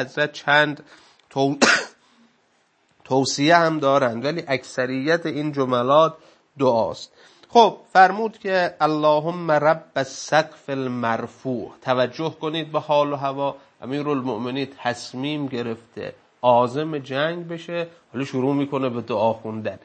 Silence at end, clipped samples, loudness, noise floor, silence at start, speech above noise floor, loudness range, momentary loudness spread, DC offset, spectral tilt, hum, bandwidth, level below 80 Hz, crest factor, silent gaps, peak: 0.05 s; under 0.1%; -21 LUFS; -64 dBFS; 0 s; 42 dB; 6 LU; 13 LU; under 0.1%; -4.5 dB/octave; none; 8.8 kHz; -70 dBFS; 22 dB; none; 0 dBFS